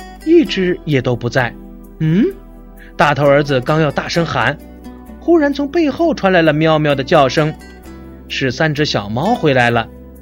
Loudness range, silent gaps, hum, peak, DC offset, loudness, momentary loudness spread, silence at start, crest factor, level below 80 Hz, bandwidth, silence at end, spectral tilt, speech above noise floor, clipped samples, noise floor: 2 LU; none; none; 0 dBFS; under 0.1%; -14 LUFS; 15 LU; 0 s; 14 dB; -38 dBFS; 16.5 kHz; 0 s; -6.5 dB/octave; 22 dB; under 0.1%; -36 dBFS